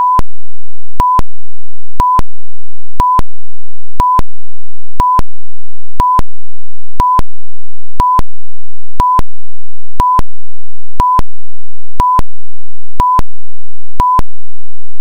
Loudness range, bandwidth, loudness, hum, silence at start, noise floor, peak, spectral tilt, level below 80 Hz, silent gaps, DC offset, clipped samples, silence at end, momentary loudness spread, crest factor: 0 LU; 18.5 kHz; -13 LUFS; none; 0 s; -52 dBFS; 0 dBFS; -6.5 dB/octave; -22 dBFS; none; 80%; 30%; 0 s; 17 LU; 10 dB